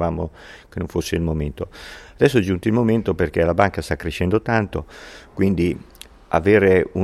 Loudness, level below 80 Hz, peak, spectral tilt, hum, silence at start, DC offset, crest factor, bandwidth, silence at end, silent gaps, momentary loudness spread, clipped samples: -20 LUFS; -38 dBFS; 0 dBFS; -7 dB/octave; none; 0 s; under 0.1%; 20 dB; 14.5 kHz; 0 s; none; 16 LU; under 0.1%